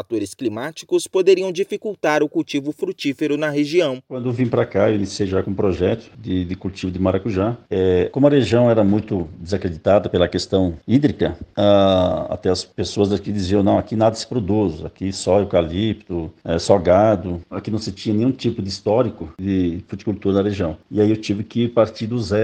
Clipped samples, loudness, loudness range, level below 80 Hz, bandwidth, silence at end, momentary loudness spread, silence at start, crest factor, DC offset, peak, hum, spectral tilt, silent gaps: under 0.1%; -20 LUFS; 3 LU; -46 dBFS; 12 kHz; 0 s; 10 LU; 0 s; 18 dB; under 0.1%; 0 dBFS; none; -6.5 dB/octave; none